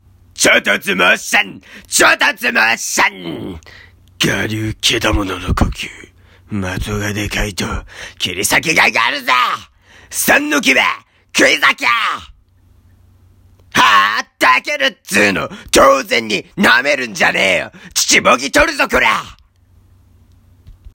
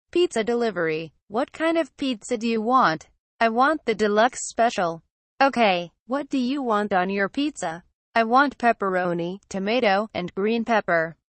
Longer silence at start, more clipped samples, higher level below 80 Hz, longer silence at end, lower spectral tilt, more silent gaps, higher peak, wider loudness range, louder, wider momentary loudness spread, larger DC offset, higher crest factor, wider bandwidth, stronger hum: first, 0.35 s vs 0.15 s; neither; first, -34 dBFS vs -62 dBFS; about the same, 0.2 s vs 0.25 s; second, -2.5 dB/octave vs -4.5 dB/octave; second, none vs 1.22-1.27 s, 3.19-3.39 s, 5.10-5.38 s, 6.00-6.06 s, 7.94-8.13 s; first, 0 dBFS vs -8 dBFS; first, 6 LU vs 2 LU; first, -13 LUFS vs -23 LUFS; about the same, 12 LU vs 10 LU; neither; about the same, 16 dB vs 16 dB; first, 17 kHz vs 8.4 kHz; neither